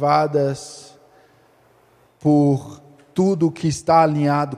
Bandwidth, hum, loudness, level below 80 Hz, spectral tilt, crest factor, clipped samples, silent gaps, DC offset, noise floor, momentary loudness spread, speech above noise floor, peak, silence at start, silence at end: 12 kHz; none; -19 LUFS; -58 dBFS; -7 dB/octave; 18 dB; under 0.1%; none; under 0.1%; -56 dBFS; 16 LU; 38 dB; -2 dBFS; 0 s; 0 s